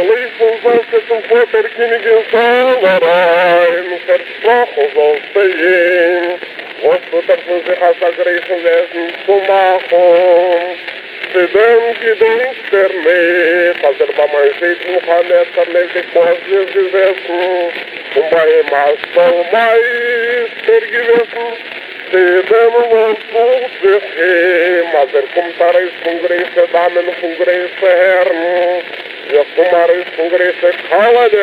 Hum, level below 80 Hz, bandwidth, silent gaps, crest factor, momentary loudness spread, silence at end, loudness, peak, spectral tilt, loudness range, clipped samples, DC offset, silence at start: none; -66 dBFS; 5.2 kHz; none; 12 dB; 7 LU; 0 s; -11 LUFS; 0 dBFS; -5 dB/octave; 2 LU; under 0.1%; under 0.1%; 0 s